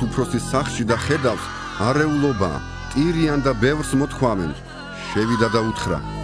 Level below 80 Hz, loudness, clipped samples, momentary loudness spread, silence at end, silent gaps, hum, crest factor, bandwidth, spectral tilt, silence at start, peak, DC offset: -36 dBFS; -21 LUFS; under 0.1%; 9 LU; 0 s; none; none; 18 dB; 11 kHz; -6 dB/octave; 0 s; -4 dBFS; under 0.1%